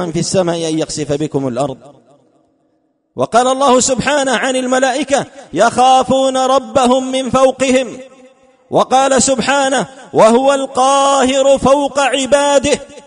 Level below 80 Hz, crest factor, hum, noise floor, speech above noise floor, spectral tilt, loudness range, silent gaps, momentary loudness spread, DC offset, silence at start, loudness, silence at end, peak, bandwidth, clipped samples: -46 dBFS; 14 dB; none; -61 dBFS; 48 dB; -3.5 dB/octave; 5 LU; none; 8 LU; under 0.1%; 0 s; -13 LUFS; 0.05 s; 0 dBFS; 11 kHz; under 0.1%